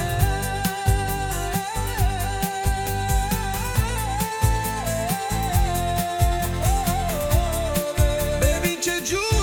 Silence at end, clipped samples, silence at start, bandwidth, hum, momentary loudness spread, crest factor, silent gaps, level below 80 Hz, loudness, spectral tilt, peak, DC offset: 0 s; under 0.1%; 0 s; 18 kHz; none; 3 LU; 18 dB; none; -28 dBFS; -23 LUFS; -4.5 dB/octave; -6 dBFS; under 0.1%